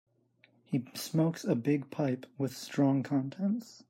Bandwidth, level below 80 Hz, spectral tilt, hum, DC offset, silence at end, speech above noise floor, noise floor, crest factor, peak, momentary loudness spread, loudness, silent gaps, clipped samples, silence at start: 16 kHz; -78 dBFS; -7 dB/octave; none; under 0.1%; 0.15 s; 36 dB; -68 dBFS; 16 dB; -16 dBFS; 7 LU; -32 LUFS; none; under 0.1%; 0.7 s